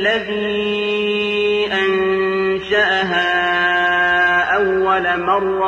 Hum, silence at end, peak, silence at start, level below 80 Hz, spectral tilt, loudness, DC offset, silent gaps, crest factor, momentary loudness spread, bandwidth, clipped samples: none; 0 s; -4 dBFS; 0 s; -48 dBFS; -5 dB/octave; -16 LUFS; under 0.1%; none; 12 dB; 5 LU; 8.2 kHz; under 0.1%